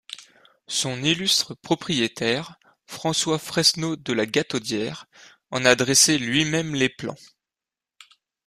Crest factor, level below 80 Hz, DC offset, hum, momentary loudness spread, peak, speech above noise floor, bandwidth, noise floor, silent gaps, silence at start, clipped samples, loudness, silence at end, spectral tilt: 24 dB; -60 dBFS; under 0.1%; none; 16 LU; -2 dBFS; 66 dB; 15.5 kHz; -90 dBFS; none; 0.1 s; under 0.1%; -22 LUFS; 1.3 s; -2.5 dB/octave